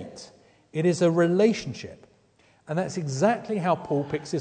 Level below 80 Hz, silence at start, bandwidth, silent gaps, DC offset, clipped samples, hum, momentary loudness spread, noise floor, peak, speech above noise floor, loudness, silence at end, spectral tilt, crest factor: -64 dBFS; 0 s; 9.4 kHz; none; under 0.1%; under 0.1%; none; 17 LU; -61 dBFS; -8 dBFS; 37 dB; -25 LUFS; 0 s; -6.5 dB/octave; 18 dB